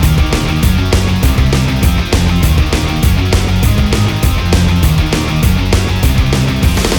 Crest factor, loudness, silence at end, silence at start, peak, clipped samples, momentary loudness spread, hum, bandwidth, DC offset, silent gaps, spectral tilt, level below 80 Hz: 10 dB; -12 LUFS; 0 s; 0 s; 0 dBFS; under 0.1%; 1 LU; none; over 20 kHz; under 0.1%; none; -5.5 dB/octave; -14 dBFS